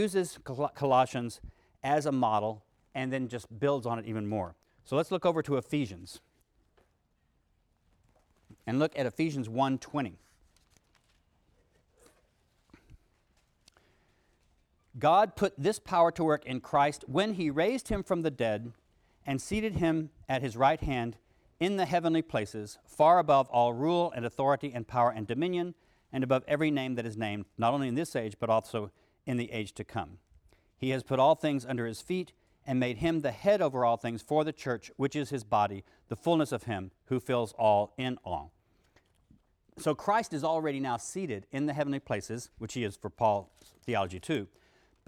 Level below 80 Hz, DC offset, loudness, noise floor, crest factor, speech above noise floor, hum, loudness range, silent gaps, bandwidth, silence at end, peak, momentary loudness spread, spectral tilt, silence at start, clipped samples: -58 dBFS; under 0.1%; -31 LUFS; -73 dBFS; 20 dB; 43 dB; none; 7 LU; none; 15 kHz; 0.6 s; -12 dBFS; 12 LU; -6 dB/octave; 0 s; under 0.1%